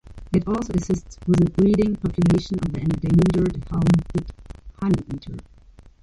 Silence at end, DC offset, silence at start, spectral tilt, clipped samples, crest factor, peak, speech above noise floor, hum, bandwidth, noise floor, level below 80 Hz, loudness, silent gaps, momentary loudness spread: 0.2 s; under 0.1%; 0.05 s; -8 dB/octave; under 0.1%; 14 dB; -6 dBFS; 27 dB; none; 11 kHz; -48 dBFS; -38 dBFS; -21 LUFS; none; 11 LU